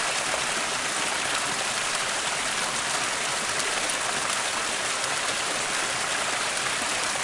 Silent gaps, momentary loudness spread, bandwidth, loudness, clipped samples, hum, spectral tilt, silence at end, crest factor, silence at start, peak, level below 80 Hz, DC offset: none; 1 LU; 11.5 kHz; -25 LUFS; under 0.1%; none; 0 dB/octave; 0 s; 20 dB; 0 s; -6 dBFS; -60 dBFS; under 0.1%